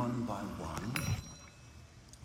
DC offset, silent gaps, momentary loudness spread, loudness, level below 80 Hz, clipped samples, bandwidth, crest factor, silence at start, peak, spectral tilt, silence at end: under 0.1%; none; 19 LU; -39 LUFS; -54 dBFS; under 0.1%; 17 kHz; 24 dB; 0 s; -16 dBFS; -5.5 dB/octave; 0 s